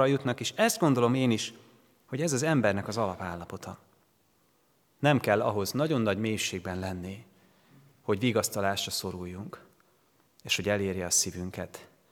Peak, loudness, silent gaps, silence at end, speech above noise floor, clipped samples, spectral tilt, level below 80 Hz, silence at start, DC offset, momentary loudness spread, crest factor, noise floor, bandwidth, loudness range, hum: -8 dBFS; -29 LUFS; none; 0.25 s; 40 dB; under 0.1%; -4 dB/octave; -70 dBFS; 0 s; under 0.1%; 17 LU; 22 dB; -68 dBFS; 19.5 kHz; 4 LU; none